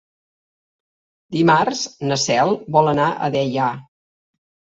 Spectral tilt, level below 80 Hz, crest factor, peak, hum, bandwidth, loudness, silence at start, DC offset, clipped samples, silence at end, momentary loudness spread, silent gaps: -4.5 dB/octave; -60 dBFS; 20 dB; 0 dBFS; none; 8 kHz; -18 LUFS; 1.3 s; under 0.1%; under 0.1%; 0.95 s; 8 LU; none